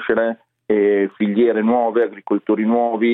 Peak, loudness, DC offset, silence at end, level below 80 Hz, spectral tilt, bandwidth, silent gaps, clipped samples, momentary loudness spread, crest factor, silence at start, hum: -4 dBFS; -18 LUFS; under 0.1%; 0 s; -64 dBFS; -10 dB/octave; 4 kHz; none; under 0.1%; 6 LU; 14 dB; 0 s; none